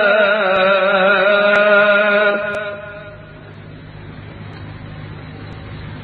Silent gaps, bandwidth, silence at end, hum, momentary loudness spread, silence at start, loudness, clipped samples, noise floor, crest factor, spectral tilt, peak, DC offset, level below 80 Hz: none; 4.8 kHz; 0 s; none; 23 LU; 0 s; -13 LUFS; under 0.1%; -36 dBFS; 16 dB; -6.5 dB/octave; 0 dBFS; under 0.1%; -46 dBFS